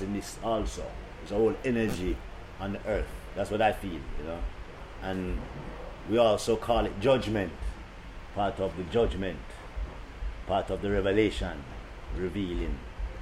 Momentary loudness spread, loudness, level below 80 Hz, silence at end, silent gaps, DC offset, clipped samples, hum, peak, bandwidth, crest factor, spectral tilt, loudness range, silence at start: 16 LU; -31 LUFS; -40 dBFS; 0 s; none; under 0.1%; under 0.1%; none; -12 dBFS; 15.5 kHz; 20 dB; -6 dB/octave; 4 LU; 0 s